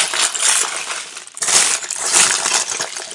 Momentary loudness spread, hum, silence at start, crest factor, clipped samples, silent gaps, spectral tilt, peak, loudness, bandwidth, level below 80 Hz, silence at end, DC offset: 12 LU; none; 0 s; 18 dB; under 0.1%; none; 2 dB/octave; 0 dBFS; -14 LUFS; 12 kHz; -70 dBFS; 0 s; under 0.1%